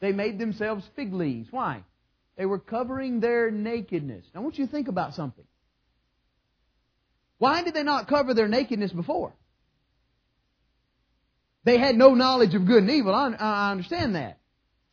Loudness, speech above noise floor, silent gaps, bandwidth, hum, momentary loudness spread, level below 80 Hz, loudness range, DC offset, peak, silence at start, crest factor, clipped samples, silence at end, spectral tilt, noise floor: -24 LUFS; 49 dB; none; 5.4 kHz; none; 13 LU; -60 dBFS; 11 LU; under 0.1%; -2 dBFS; 0 s; 24 dB; under 0.1%; 0.6 s; -7 dB/octave; -73 dBFS